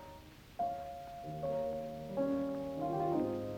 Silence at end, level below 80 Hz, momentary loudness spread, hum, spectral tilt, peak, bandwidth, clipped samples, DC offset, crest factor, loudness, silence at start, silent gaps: 0 s; -62 dBFS; 12 LU; none; -8 dB/octave; -24 dBFS; over 20 kHz; under 0.1%; under 0.1%; 14 dB; -38 LUFS; 0 s; none